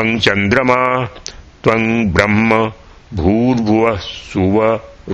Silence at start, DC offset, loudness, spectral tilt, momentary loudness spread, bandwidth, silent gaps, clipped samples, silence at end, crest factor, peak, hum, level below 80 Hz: 0 s; under 0.1%; -14 LUFS; -6 dB/octave; 10 LU; 8.6 kHz; none; under 0.1%; 0 s; 14 dB; 0 dBFS; none; -36 dBFS